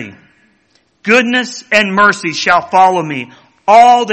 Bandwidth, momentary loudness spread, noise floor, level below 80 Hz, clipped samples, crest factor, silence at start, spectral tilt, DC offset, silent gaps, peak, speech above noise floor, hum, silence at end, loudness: 8.8 kHz; 16 LU; -56 dBFS; -56 dBFS; 0.4%; 12 dB; 0 s; -3.5 dB/octave; under 0.1%; none; 0 dBFS; 46 dB; none; 0 s; -10 LUFS